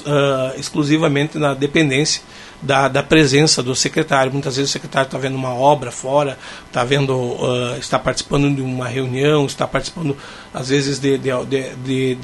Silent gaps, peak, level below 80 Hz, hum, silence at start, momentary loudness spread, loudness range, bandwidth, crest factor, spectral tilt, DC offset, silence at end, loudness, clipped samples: none; 0 dBFS; -44 dBFS; none; 0 s; 8 LU; 4 LU; 11.5 kHz; 18 dB; -4.5 dB/octave; under 0.1%; 0 s; -17 LUFS; under 0.1%